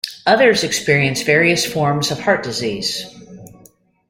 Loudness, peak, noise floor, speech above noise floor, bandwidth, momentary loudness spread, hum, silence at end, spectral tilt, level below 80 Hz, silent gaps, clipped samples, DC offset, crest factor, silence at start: -16 LUFS; 0 dBFS; -50 dBFS; 34 dB; 16.5 kHz; 9 LU; none; 0.6 s; -3.5 dB/octave; -54 dBFS; none; under 0.1%; under 0.1%; 18 dB; 0.05 s